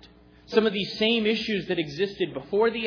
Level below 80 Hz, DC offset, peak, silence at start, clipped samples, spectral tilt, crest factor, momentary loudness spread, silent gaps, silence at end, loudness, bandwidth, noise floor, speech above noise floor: -58 dBFS; under 0.1%; -8 dBFS; 0 s; under 0.1%; -5.5 dB/octave; 18 dB; 6 LU; none; 0 s; -25 LUFS; 5.4 kHz; -52 dBFS; 27 dB